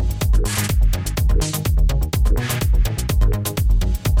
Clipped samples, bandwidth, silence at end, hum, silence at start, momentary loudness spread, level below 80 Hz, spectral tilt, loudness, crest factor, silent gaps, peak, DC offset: under 0.1%; 17 kHz; 0 s; none; 0 s; 1 LU; -18 dBFS; -5 dB/octave; -20 LUFS; 12 dB; none; -6 dBFS; under 0.1%